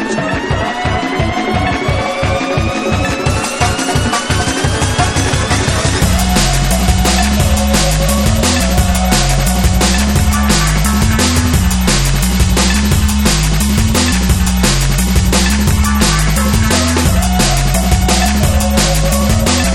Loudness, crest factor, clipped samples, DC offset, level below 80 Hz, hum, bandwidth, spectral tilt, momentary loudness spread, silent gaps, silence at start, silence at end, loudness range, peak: -12 LUFS; 12 dB; under 0.1%; under 0.1%; -16 dBFS; none; 17 kHz; -4 dB/octave; 4 LU; none; 0 s; 0 s; 3 LU; 0 dBFS